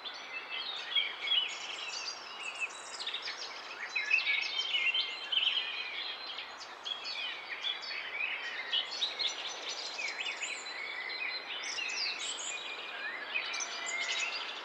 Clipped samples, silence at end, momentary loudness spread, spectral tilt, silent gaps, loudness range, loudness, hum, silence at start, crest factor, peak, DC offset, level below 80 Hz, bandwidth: under 0.1%; 0 s; 10 LU; 2.5 dB/octave; none; 4 LU; -34 LUFS; none; 0 s; 20 dB; -18 dBFS; under 0.1%; -86 dBFS; 16 kHz